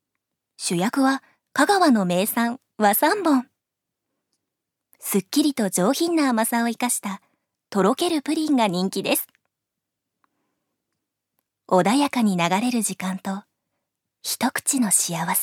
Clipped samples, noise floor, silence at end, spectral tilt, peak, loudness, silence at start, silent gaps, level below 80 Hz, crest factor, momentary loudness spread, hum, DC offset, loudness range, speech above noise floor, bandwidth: under 0.1%; -83 dBFS; 0 s; -3.5 dB/octave; -4 dBFS; -21 LUFS; 0.6 s; none; -76 dBFS; 20 dB; 10 LU; none; under 0.1%; 5 LU; 62 dB; 18 kHz